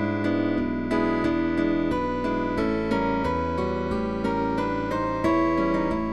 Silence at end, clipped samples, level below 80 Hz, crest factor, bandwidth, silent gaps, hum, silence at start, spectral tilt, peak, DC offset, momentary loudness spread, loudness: 0 s; under 0.1%; -42 dBFS; 14 dB; 11 kHz; none; none; 0 s; -7.5 dB/octave; -10 dBFS; 0.7%; 4 LU; -25 LUFS